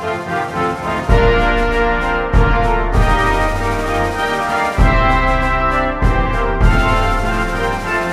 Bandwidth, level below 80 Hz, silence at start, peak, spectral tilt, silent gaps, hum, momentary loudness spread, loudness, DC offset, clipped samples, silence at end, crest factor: 12.5 kHz; -18 dBFS; 0 s; 0 dBFS; -6 dB/octave; none; none; 5 LU; -16 LUFS; under 0.1%; under 0.1%; 0 s; 14 dB